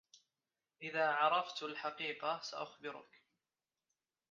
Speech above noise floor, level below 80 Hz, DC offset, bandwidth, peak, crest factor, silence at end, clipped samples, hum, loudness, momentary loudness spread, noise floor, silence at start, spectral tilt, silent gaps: over 51 dB; under -90 dBFS; under 0.1%; 7.4 kHz; -20 dBFS; 22 dB; 1.3 s; under 0.1%; none; -38 LUFS; 16 LU; under -90 dBFS; 0.8 s; 0 dB/octave; none